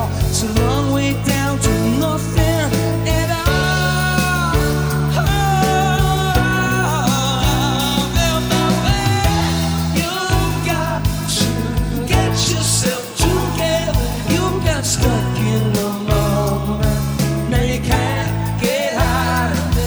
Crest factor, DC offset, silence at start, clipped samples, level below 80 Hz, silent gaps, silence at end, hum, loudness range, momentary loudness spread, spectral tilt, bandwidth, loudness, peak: 14 dB; under 0.1%; 0 s; under 0.1%; -26 dBFS; none; 0 s; none; 2 LU; 3 LU; -4.5 dB/octave; over 20 kHz; -17 LUFS; -2 dBFS